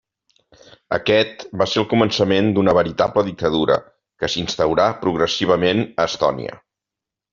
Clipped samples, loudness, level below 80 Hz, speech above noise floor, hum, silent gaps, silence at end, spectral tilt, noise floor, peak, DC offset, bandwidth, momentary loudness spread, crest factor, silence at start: under 0.1%; -19 LUFS; -50 dBFS; 68 dB; none; none; 0.75 s; -4 dB/octave; -86 dBFS; -2 dBFS; under 0.1%; 7.4 kHz; 6 LU; 18 dB; 0.9 s